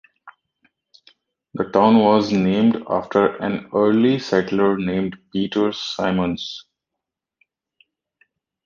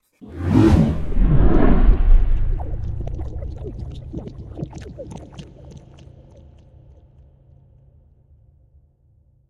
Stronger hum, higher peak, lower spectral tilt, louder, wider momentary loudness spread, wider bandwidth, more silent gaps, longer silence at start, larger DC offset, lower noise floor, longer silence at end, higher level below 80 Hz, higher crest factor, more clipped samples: neither; about the same, -2 dBFS vs -2 dBFS; second, -7 dB/octave vs -9 dB/octave; about the same, -19 LUFS vs -21 LUFS; second, 11 LU vs 23 LU; about the same, 7.2 kHz vs 6.6 kHz; neither; about the same, 0.25 s vs 0.25 s; neither; first, -83 dBFS vs -57 dBFS; second, 2.05 s vs 3.7 s; second, -56 dBFS vs -22 dBFS; about the same, 20 dB vs 16 dB; neither